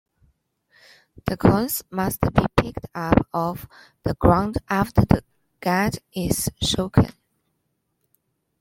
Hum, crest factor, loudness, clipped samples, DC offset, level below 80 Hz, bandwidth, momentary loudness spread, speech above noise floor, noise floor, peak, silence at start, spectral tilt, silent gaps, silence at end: none; 22 dB; -22 LUFS; under 0.1%; under 0.1%; -38 dBFS; 16.5 kHz; 11 LU; 52 dB; -74 dBFS; 0 dBFS; 1.25 s; -5.5 dB/octave; none; 1.5 s